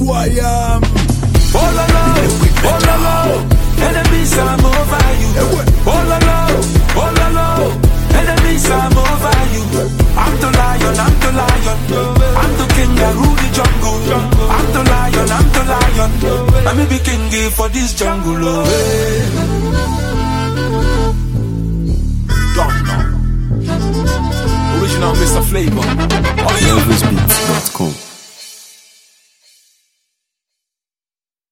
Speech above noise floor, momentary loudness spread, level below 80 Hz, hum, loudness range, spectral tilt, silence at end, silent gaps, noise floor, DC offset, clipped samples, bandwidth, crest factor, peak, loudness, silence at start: over 77 dB; 5 LU; -16 dBFS; none; 4 LU; -5 dB/octave; 2.9 s; none; under -90 dBFS; under 0.1%; under 0.1%; 17 kHz; 12 dB; 0 dBFS; -13 LUFS; 0 s